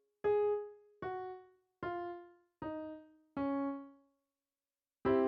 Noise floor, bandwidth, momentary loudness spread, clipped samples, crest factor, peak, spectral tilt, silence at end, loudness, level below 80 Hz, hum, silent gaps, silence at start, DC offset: under -90 dBFS; 5 kHz; 18 LU; under 0.1%; 18 dB; -20 dBFS; -6 dB/octave; 0 s; -40 LUFS; -70 dBFS; none; none; 0.25 s; under 0.1%